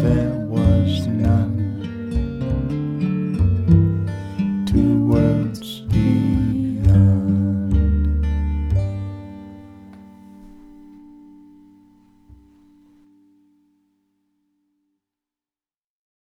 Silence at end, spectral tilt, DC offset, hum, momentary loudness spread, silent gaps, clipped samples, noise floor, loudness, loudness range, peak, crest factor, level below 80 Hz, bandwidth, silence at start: 5.25 s; -9 dB/octave; under 0.1%; none; 11 LU; none; under 0.1%; under -90 dBFS; -19 LUFS; 9 LU; -4 dBFS; 18 dB; -28 dBFS; 9.4 kHz; 0 s